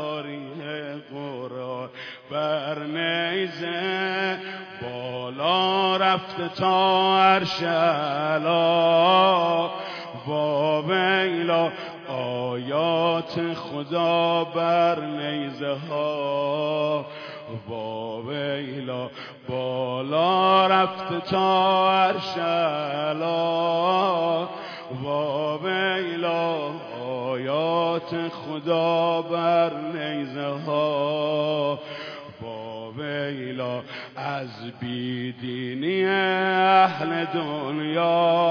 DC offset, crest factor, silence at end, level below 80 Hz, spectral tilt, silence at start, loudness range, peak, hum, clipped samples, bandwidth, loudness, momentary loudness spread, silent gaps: under 0.1%; 20 dB; 0 s; -72 dBFS; -6.5 dB/octave; 0 s; 8 LU; -4 dBFS; none; under 0.1%; 5.4 kHz; -24 LUFS; 15 LU; none